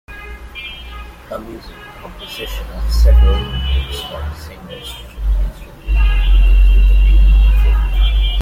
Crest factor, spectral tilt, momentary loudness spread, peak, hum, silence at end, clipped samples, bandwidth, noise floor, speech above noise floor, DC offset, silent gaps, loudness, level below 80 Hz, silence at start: 10 dB; -6 dB/octave; 20 LU; -2 dBFS; none; 0 s; under 0.1%; 7.2 kHz; -32 dBFS; 15 dB; under 0.1%; none; -16 LUFS; -14 dBFS; 0.1 s